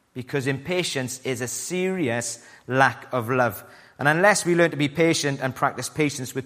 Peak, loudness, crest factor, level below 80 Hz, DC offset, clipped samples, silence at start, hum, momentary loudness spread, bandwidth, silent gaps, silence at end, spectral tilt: -2 dBFS; -23 LUFS; 22 dB; -64 dBFS; under 0.1%; under 0.1%; 0.15 s; none; 10 LU; 15.5 kHz; none; 0 s; -4 dB/octave